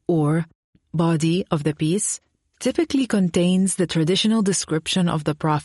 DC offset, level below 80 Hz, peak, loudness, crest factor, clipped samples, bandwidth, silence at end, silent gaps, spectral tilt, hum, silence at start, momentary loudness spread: under 0.1%; -56 dBFS; -8 dBFS; -21 LUFS; 14 dB; under 0.1%; 11.5 kHz; 0 s; 0.55-0.73 s; -5 dB/octave; none; 0.1 s; 6 LU